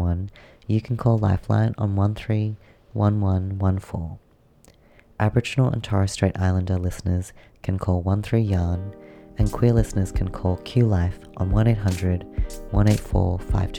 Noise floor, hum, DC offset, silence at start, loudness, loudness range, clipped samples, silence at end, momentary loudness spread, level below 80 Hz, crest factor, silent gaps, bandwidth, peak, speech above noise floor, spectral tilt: -54 dBFS; none; under 0.1%; 0 s; -23 LUFS; 2 LU; under 0.1%; 0 s; 11 LU; -34 dBFS; 18 dB; none; 12 kHz; -4 dBFS; 33 dB; -7.5 dB/octave